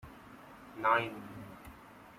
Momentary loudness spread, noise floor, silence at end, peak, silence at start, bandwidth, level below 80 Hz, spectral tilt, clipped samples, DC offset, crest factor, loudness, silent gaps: 23 LU; -54 dBFS; 0 s; -16 dBFS; 0.05 s; 16.5 kHz; -66 dBFS; -5.5 dB/octave; under 0.1%; under 0.1%; 22 dB; -32 LUFS; none